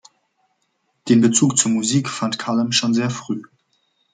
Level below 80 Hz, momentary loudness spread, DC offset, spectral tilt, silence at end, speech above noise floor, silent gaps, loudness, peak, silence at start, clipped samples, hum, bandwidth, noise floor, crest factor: -64 dBFS; 13 LU; under 0.1%; -4 dB/octave; 0.7 s; 51 dB; none; -18 LUFS; -2 dBFS; 1.05 s; under 0.1%; none; 9.6 kHz; -69 dBFS; 18 dB